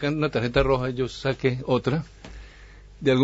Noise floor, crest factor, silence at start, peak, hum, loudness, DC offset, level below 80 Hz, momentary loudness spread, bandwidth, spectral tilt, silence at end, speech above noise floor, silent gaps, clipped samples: -46 dBFS; 20 dB; 0 s; -6 dBFS; none; -25 LUFS; under 0.1%; -40 dBFS; 21 LU; 8 kHz; -7 dB/octave; 0 s; 22 dB; none; under 0.1%